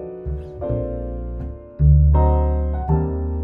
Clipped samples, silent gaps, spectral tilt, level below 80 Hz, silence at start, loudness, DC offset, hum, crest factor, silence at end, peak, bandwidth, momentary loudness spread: under 0.1%; none; -13.5 dB/octave; -20 dBFS; 0 s; -20 LUFS; under 0.1%; none; 14 dB; 0 s; -4 dBFS; 2.2 kHz; 15 LU